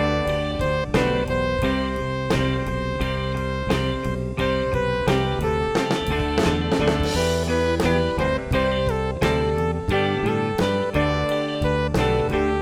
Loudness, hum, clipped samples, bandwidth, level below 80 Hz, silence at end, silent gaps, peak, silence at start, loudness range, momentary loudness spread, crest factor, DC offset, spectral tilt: -22 LUFS; none; under 0.1%; 17 kHz; -32 dBFS; 0 s; none; -4 dBFS; 0 s; 2 LU; 4 LU; 16 dB; under 0.1%; -6 dB/octave